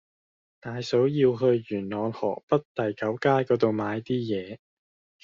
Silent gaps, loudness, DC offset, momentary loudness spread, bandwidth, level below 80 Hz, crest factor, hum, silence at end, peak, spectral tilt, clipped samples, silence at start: 2.43-2.48 s, 2.65-2.75 s; -26 LUFS; under 0.1%; 12 LU; 7.4 kHz; -66 dBFS; 20 dB; none; 0.65 s; -8 dBFS; -6 dB/octave; under 0.1%; 0.65 s